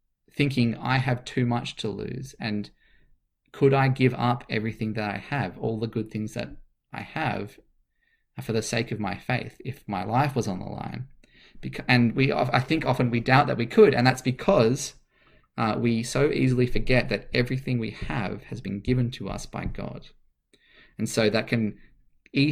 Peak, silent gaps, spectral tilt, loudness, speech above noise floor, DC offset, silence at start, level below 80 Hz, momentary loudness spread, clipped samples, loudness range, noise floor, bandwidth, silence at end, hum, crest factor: -4 dBFS; none; -6 dB/octave; -26 LUFS; 45 dB; under 0.1%; 0.35 s; -44 dBFS; 15 LU; under 0.1%; 9 LU; -70 dBFS; 14.5 kHz; 0 s; none; 22 dB